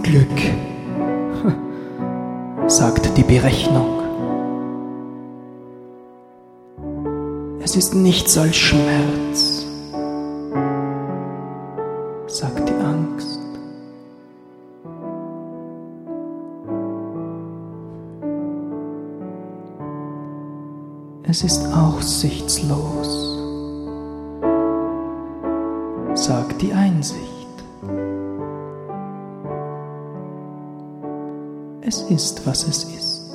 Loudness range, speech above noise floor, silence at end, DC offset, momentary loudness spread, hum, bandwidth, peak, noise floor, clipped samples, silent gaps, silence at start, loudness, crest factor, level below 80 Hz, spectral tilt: 13 LU; 28 dB; 0 s; under 0.1%; 20 LU; none; 15.5 kHz; 0 dBFS; -45 dBFS; under 0.1%; none; 0 s; -21 LUFS; 20 dB; -40 dBFS; -4.5 dB/octave